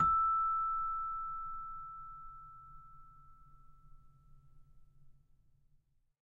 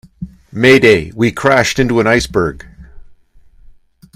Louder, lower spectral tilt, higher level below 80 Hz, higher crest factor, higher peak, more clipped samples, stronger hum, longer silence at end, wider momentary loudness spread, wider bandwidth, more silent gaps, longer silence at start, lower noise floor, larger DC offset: second, -35 LUFS vs -12 LUFS; first, -6.5 dB/octave vs -5 dB/octave; second, -58 dBFS vs -38 dBFS; about the same, 18 dB vs 14 dB; second, -22 dBFS vs 0 dBFS; second, under 0.1% vs 0.2%; neither; about the same, 1.15 s vs 1.15 s; first, 25 LU vs 17 LU; second, 3.8 kHz vs 15.5 kHz; neither; second, 0 s vs 0.2 s; first, -71 dBFS vs -44 dBFS; neither